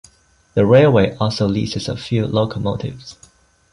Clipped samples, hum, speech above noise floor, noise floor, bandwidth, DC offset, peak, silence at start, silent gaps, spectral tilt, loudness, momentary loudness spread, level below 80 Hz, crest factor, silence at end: under 0.1%; none; 35 dB; -51 dBFS; 11.5 kHz; under 0.1%; -2 dBFS; 0.55 s; none; -7 dB/octave; -17 LUFS; 16 LU; -42 dBFS; 16 dB; 0.6 s